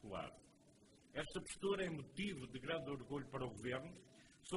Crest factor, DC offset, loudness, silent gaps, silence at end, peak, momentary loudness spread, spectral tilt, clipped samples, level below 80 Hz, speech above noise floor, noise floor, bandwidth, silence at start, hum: 18 dB; under 0.1%; -46 LUFS; none; 0 s; -30 dBFS; 15 LU; -5 dB/octave; under 0.1%; -68 dBFS; 23 dB; -69 dBFS; 11.5 kHz; 0 s; none